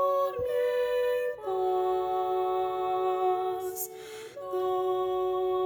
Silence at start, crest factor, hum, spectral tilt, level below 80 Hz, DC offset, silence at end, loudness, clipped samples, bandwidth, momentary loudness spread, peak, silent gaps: 0 s; 12 dB; none; -4 dB/octave; -64 dBFS; under 0.1%; 0 s; -29 LUFS; under 0.1%; over 20 kHz; 8 LU; -18 dBFS; none